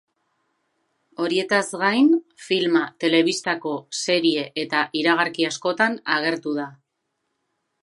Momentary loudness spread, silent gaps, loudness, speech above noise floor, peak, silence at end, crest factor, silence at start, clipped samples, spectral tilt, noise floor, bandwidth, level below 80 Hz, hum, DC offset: 8 LU; none; -21 LUFS; 55 dB; -2 dBFS; 1.1 s; 20 dB; 1.2 s; under 0.1%; -3.5 dB/octave; -77 dBFS; 11.5 kHz; -78 dBFS; none; under 0.1%